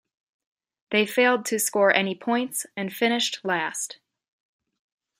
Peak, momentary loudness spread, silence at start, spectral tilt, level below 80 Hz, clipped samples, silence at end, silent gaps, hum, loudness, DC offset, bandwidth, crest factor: -4 dBFS; 9 LU; 0.9 s; -2.5 dB/octave; -78 dBFS; under 0.1%; 1.25 s; none; none; -23 LUFS; under 0.1%; 16 kHz; 22 dB